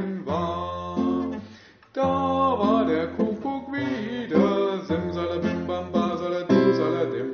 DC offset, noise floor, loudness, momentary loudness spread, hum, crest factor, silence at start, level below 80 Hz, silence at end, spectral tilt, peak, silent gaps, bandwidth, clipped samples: under 0.1%; -49 dBFS; -25 LUFS; 9 LU; none; 18 dB; 0 s; -54 dBFS; 0 s; -6 dB/octave; -6 dBFS; none; 6.8 kHz; under 0.1%